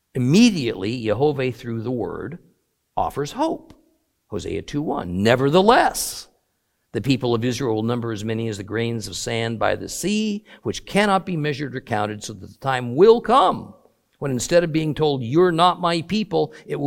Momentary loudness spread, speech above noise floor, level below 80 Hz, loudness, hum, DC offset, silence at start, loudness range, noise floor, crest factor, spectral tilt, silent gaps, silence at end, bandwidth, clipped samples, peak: 14 LU; 51 dB; -50 dBFS; -21 LUFS; none; under 0.1%; 0.15 s; 6 LU; -71 dBFS; 20 dB; -5.5 dB/octave; none; 0 s; 16.5 kHz; under 0.1%; 0 dBFS